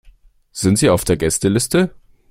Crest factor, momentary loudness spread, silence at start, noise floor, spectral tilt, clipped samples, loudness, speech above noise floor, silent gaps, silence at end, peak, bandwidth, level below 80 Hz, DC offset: 16 dB; 7 LU; 0.05 s; -48 dBFS; -5 dB/octave; under 0.1%; -16 LUFS; 33 dB; none; 0.4 s; -2 dBFS; 16.5 kHz; -40 dBFS; under 0.1%